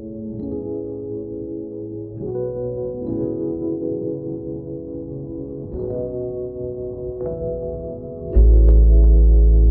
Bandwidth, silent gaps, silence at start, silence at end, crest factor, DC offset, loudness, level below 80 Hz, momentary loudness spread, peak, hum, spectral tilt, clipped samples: 1.2 kHz; none; 0 s; 0 s; 14 dB; under 0.1%; -22 LUFS; -20 dBFS; 16 LU; -4 dBFS; none; -15.5 dB/octave; under 0.1%